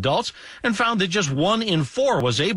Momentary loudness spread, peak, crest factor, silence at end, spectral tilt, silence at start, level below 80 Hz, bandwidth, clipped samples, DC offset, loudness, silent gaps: 5 LU; -10 dBFS; 12 dB; 0 s; -4.5 dB/octave; 0 s; -54 dBFS; 11.5 kHz; under 0.1%; under 0.1%; -21 LUFS; none